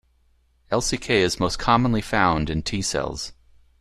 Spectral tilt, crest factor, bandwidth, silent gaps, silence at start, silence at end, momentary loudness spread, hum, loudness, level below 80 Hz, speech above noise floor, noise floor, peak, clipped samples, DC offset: -4.5 dB/octave; 20 dB; 13.5 kHz; none; 0.7 s; 0.45 s; 8 LU; none; -22 LUFS; -40 dBFS; 40 dB; -62 dBFS; -4 dBFS; under 0.1%; under 0.1%